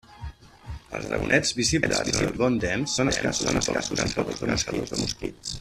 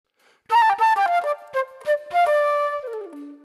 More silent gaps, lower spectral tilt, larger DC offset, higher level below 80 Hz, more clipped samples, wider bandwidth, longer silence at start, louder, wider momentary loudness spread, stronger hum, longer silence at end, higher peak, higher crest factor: neither; first, -3.5 dB/octave vs -2 dB/octave; neither; first, -42 dBFS vs -72 dBFS; neither; about the same, 14 kHz vs 13 kHz; second, 0.1 s vs 0.5 s; second, -25 LUFS vs -21 LUFS; about the same, 14 LU vs 13 LU; neither; about the same, 0 s vs 0.1 s; first, -4 dBFS vs -10 dBFS; first, 22 dB vs 12 dB